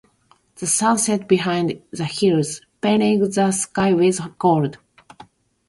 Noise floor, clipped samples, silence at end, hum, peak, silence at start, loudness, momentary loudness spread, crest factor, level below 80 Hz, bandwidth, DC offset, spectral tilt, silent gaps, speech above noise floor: -59 dBFS; under 0.1%; 0.45 s; none; -4 dBFS; 0.6 s; -19 LUFS; 10 LU; 16 dB; -58 dBFS; 11.5 kHz; under 0.1%; -4.5 dB/octave; none; 40 dB